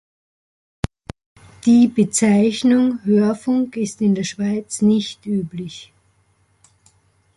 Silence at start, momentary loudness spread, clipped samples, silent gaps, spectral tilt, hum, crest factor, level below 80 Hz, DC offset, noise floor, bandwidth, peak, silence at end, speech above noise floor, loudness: 1.65 s; 15 LU; under 0.1%; none; -5.5 dB/octave; none; 16 dB; -50 dBFS; under 0.1%; -61 dBFS; 11.5 kHz; -4 dBFS; 1.55 s; 44 dB; -18 LUFS